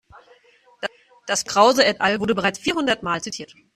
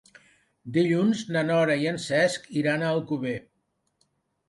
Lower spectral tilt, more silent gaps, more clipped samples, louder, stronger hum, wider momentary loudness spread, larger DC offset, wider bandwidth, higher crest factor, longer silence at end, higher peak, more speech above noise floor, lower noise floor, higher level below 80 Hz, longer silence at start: second, -3 dB/octave vs -5.5 dB/octave; neither; neither; first, -20 LUFS vs -25 LUFS; neither; first, 16 LU vs 7 LU; neither; first, 14.5 kHz vs 11.5 kHz; about the same, 20 dB vs 16 dB; second, 0.3 s vs 1.05 s; first, -2 dBFS vs -10 dBFS; second, 35 dB vs 47 dB; second, -55 dBFS vs -72 dBFS; first, -58 dBFS vs -68 dBFS; first, 0.8 s vs 0.65 s